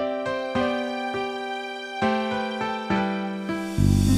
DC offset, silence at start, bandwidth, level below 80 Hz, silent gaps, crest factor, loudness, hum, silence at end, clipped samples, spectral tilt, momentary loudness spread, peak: under 0.1%; 0 s; 15 kHz; -38 dBFS; none; 18 dB; -26 LUFS; none; 0 s; under 0.1%; -6 dB/octave; 6 LU; -8 dBFS